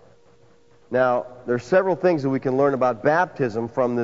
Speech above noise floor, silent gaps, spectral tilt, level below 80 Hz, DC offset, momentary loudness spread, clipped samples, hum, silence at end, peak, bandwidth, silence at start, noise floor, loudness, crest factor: 35 dB; none; -7.5 dB/octave; -62 dBFS; 0.2%; 7 LU; under 0.1%; none; 0 s; -6 dBFS; 7.8 kHz; 0.9 s; -56 dBFS; -22 LUFS; 16 dB